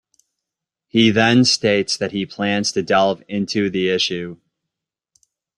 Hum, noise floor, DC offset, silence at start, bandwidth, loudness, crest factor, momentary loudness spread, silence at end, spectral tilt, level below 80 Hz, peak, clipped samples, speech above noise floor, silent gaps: none; -84 dBFS; under 0.1%; 0.95 s; 11 kHz; -18 LUFS; 18 dB; 10 LU; 1.2 s; -4 dB/octave; -58 dBFS; -2 dBFS; under 0.1%; 66 dB; none